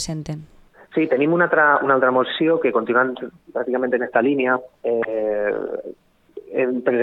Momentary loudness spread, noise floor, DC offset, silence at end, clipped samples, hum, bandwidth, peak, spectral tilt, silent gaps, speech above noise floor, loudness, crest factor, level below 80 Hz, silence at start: 14 LU; -41 dBFS; under 0.1%; 0 s; under 0.1%; none; 11 kHz; -2 dBFS; -5.5 dB/octave; none; 21 dB; -20 LUFS; 18 dB; -56 dBFS; 0 s